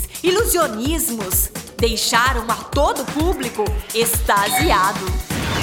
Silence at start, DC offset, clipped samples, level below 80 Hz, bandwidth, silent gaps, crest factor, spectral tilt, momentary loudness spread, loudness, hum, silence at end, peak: 0 s; under 0.1%; under 0.1%; -28 dBFS; over 20 kHz; none; 18 dB; -3.5 dB/octave; 7 LU; -18 LUFS; none; 0 s; -2 dBFS